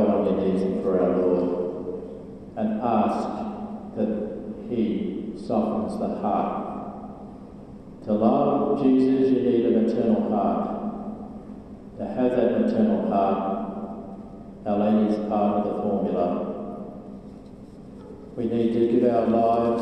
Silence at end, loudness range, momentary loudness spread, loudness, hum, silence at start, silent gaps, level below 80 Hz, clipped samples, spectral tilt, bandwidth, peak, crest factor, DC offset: 0 s; 6 LU; 20 LU; -24 LUFS; none; 0 s; none; -52 dBFS; under 0.1%; -9 dB/octave; 8.8 kHz; -6 dBFS; 18 dB; under 0.1%